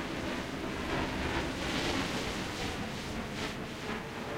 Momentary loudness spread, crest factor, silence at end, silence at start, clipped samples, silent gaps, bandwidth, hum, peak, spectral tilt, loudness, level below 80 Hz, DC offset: 6 LU; 16 dB; 0 s; 0 s; under 0.1%; none; 16 kHz; none; -20 dBFS; -4.5 dB/octave; -35 LUFS; -48 dBFS; under 0.1%